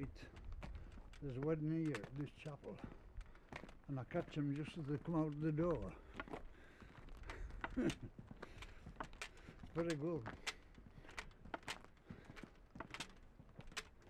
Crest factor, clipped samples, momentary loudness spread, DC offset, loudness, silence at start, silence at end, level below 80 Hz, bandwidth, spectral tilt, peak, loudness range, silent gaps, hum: 18 dB; under 0.1%; 19 LU; under 0.1%; -47 LUFS; 0 s; 0 s; -58 dBFS; 13.5 kHz; -6.5 dB/octave; -28 dBFS; 6 LU; none; none